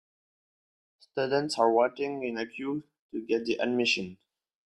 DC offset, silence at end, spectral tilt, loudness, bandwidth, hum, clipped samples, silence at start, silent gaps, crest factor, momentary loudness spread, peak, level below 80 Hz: under 0.1%; 0.55 s; -4 dB/octave; -29 LUFS; 12 kHz; none; under 0.1%; 1.15 s; 2.99-3.09 s; 20 dB; 14 LU; -10 dBFS; -72 dBFS